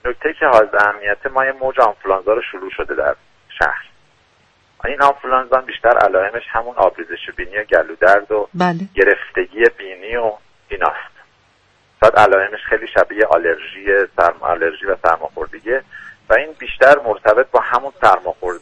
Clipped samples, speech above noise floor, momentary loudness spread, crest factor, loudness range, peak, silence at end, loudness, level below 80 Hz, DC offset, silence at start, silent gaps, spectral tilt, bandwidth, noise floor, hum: under 0.1%; 40 dB; 13 LU; 16 dB; 4 LU; 0 dBFS; 0.05 s; -15 LUFS; -44 dBFS; under 0.1%; 0.05 s; none; -5.5 dB/octave; 10.5 kHz; -55 dBFS; none